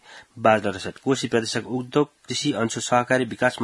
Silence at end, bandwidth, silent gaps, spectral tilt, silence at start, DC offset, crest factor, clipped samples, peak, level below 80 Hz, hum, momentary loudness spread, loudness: 0 s; 12 kHz; none; -4.5 dB/octave; 0.1 s; under 0.1%; 20 dB; under 0.1%; -2 dBFS; -62 dBFS; none; 6 LU; -23 LUFS